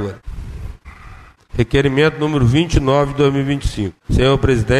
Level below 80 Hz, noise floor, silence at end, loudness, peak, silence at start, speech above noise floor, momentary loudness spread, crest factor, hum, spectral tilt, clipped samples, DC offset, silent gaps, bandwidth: -26 dBFS; -39 dBFS; 0 s; -16 LUFS; -2 dBFS; 0 s; 25 dB; 18 LU; 14 dB; none; -6.5 dB/octave; under 0.1%; under 0.1%; none; 12 kHz